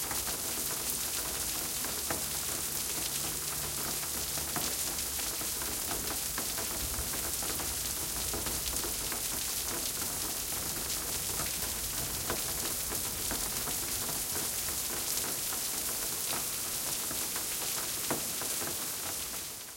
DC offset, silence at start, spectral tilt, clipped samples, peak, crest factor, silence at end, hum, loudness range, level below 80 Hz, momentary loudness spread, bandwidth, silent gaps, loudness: under 0.1%; 0 s; -1 dB/octave; under 0.1%; -12 dBFS; 24 dB; 0 s; none; 1 LU; -52 dBFS; 1 LU; 17 kHz; none; -32 LUFS